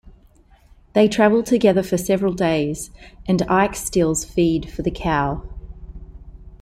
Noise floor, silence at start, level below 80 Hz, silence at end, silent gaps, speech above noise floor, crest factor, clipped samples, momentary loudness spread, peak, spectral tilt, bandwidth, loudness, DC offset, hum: -52 dBFS; 0.05 s; -38 dBFS; 0.05 s; none; 33 dB; 18 dB; under 0.1%; 19 LU; -2 dBFS; -5.5 dB/octave; 16 kHz; -19 LUFS; under 0.1%; none